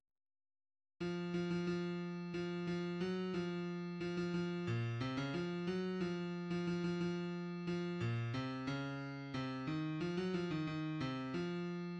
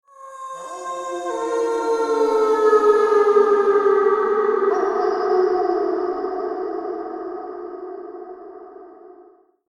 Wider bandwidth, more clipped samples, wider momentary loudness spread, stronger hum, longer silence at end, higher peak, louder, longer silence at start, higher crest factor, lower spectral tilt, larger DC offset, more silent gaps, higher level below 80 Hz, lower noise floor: second, 8.4 kHz vs 11 kHz; neither; second, 4 LU vs 19 LU; neither; second, 0 s vs 0.45 s; second, -28 dBFS vs -4 dBFS; second, -41 LUFS vs -19 LUFS; first, 1 s vs 0.2 s; about the same, 14 dB vs 16 dB; first, -7 dB/octave vs -3.5 dB/octave; neither; neither; second, -70 dBFS vs -64 dBFS; first, under -90 dBFS vs -51 dBFS